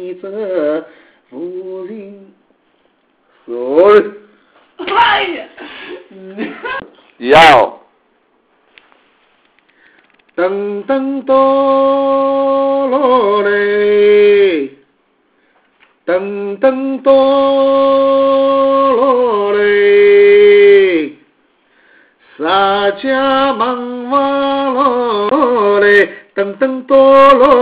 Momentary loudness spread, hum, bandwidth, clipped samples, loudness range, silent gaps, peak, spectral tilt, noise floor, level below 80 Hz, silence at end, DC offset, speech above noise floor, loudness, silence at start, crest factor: 19 LU; none; 4 kHz; 0.3%; 8 LU; none; 0 dBFS; -8 dB/octave; -57 dBFS; -50 dBFS; 0 s; under 0.1%; 46 dB; -10 LUFS; 0 s; 12 dB